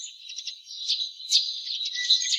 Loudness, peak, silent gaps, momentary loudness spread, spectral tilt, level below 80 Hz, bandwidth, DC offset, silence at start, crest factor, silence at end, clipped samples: -25 LUFS; -6 dBFS; none; 14 LU; 12 dB/octave; under -90 dBFS; 14.5 kHz; under 0.1%; 0 s; 22 dB; 0 s; under 0.1%